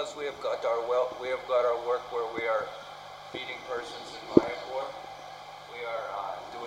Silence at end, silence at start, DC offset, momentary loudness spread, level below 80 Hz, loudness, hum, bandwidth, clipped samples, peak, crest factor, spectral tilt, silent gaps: 0 s; 0 s; under 0.1%; 18 LU; -64 dBFS; -31 LUFS; 50 Hz at -60 dBFS; 16 kHz; under 0.1%; -2 dBFS; 30 dB; -5 dB/octave; none